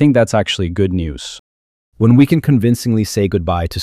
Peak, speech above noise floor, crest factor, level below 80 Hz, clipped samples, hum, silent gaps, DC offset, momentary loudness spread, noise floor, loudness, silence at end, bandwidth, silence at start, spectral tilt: 0 dBFS; over 76 dB; 14 dB; -36 dBFS; under 0.1%; none; 1.39-1.92 s; under 0.1%; 13 LU; under -90 dBFS; -15 LUFS; 0 s; 15.5 kHz; 0 s; -6.5 dB/octave